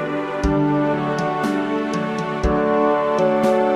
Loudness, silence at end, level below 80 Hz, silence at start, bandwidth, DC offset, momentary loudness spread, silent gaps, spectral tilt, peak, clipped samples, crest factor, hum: -20 LUFS; 0 s; -34 dBFS; 0 s; 14 kHz; under 0.1%; 5 LU; none; -7 dB/octave; -6 dBFS; under 0.1%; 14 dB; none